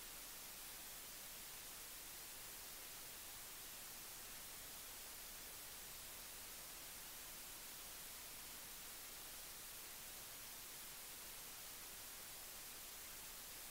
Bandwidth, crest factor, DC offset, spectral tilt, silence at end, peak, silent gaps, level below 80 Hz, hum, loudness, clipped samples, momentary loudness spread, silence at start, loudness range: 16 kHz; 14 dB; under 0.1%; 0 dB/octave; 0 s; -40 dBFS; none; -70 dBFS; none; -51 LUFS; under 0.1%; 0 LU; 0 s; 0 LU